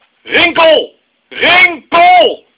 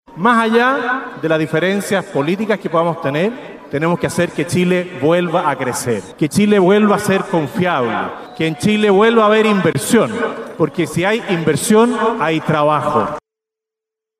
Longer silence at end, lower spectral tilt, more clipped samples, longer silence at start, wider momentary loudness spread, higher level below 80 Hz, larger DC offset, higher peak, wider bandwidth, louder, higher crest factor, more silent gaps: second, 0.2 s vs 1 s; about the same, -5.5 dB/octave vs -5.5 dB/octave; first, 1% vs under 0.1%; first, 0.25 s vs 0.1 s; about the same, 8 LU vs 9 LU; first, -48 dBFS vs -54 dBFS; neither; about the same, 0 dBFS vs 0 dBFS; second, 4 kHz vs 15 kHz; first, -7 LUFS vs -15 LUFS; about the same, 10 dB vs 14 dB; neither